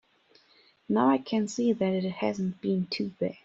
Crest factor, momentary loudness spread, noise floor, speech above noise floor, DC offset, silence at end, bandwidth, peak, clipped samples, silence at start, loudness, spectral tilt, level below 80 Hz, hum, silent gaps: 18 dB; 7 LU; -63 dBFS; 35 dB; under 0.1%; 0.1 s; 7.8 kHz; -10 dBFS; under 0.1%; 0.9 s; -28 LUFS; -6.5 dB/octave; -70 dBFS; none; none